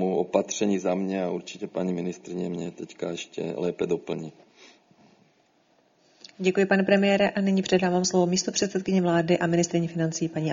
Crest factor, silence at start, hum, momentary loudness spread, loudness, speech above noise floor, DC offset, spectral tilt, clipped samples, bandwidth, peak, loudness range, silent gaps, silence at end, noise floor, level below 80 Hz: 20 dB; 0 s; none; 11 LU; -26 LUFS; 39 dB; under 0.1%; -5 dB/octave; under 0.1%; 7.6 kHz; -6 dBFS; 11 LU; none; 0 s; -64 dBFS; -64 dBFS